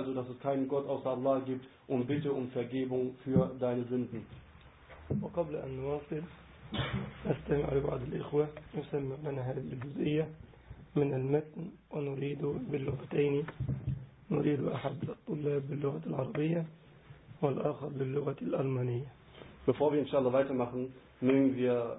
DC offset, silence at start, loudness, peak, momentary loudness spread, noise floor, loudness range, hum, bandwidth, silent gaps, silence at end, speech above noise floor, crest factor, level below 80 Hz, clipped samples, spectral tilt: under 0.1%; 0 s; -34 LUFS; -14 dBFS; 11 LU; -56 dBFS; 3 LU; none; 3.9 kHz; none; 0 s; 22 dB; 20 dB; -58 dBFS; under 0.1%; -7 dB/octave